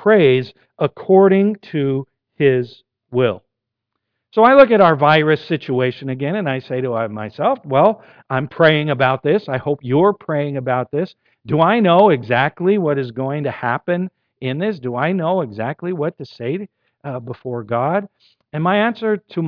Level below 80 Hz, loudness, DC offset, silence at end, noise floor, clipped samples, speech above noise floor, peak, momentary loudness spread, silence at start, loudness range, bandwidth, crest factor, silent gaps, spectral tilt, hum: -60 dBFS; -17 LUFS; under 0.1%; 0 s; -78 dBFS; under 0.1%; 62 dB; 0 dBFS; 15 LU; 0 s; 8 LU; 5.4 kHz; 16 dB; none; -9.5 dB/octave; none